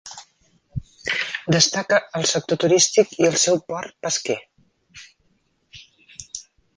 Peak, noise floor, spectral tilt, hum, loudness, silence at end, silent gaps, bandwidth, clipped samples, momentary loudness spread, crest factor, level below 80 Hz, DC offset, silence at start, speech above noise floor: -2 dBFS; -66 dBFS; -3 dB/octave; none; -20 LUFS; 0.35 s; none; 10.5 kHz; under 0.1%; 20 LU; 22 dB; -54 dBFS; under 0.1%; 0.05 s; 46 dB